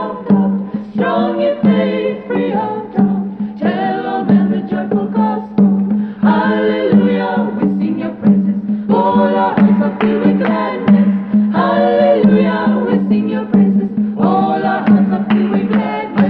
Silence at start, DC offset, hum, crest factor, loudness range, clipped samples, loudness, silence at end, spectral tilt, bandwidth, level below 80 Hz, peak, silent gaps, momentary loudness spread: 0 s; under 0.1%; none; 12 dB; 3 LU; under 0.1%; -14 LUFS; 0 s; -11 dB/octave; 4.6 kHz; -52 dBFS; 0 dBFS; none; 6 LU